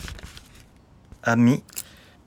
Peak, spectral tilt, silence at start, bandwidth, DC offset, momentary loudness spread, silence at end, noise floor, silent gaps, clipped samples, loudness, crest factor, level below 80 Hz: -10 dBFS; -6 dB/octave; 0 s; 20 kHz; under 0.1%; 22 LU; 0.45 s; -53 dBFS; none; under 0.1%; -22 LUFS; 16 dB; -48 dBFS